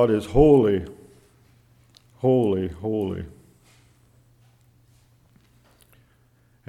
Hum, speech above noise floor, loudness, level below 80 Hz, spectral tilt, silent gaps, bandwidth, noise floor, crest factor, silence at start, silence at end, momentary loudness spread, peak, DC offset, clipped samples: none; 40 dB; -21 LUFS; -42 dBFS; -8.5 dB/octave; none; 12.5 kHz; -60 dBFS; 22 dB; 0 s; 3.4 s; 18 LU; -4 dBFS; under 0.1%; under 0.1%